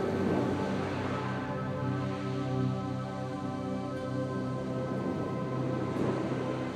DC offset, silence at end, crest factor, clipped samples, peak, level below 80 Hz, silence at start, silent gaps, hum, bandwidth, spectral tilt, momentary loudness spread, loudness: under 0.1%; 0 s; 14 dB; under 0.1%; -18 dBFS; -58 dBFS; 0 s; none; none; 9.8 kHz; -7.5 dB/octave; 5 LU; -33 LUFS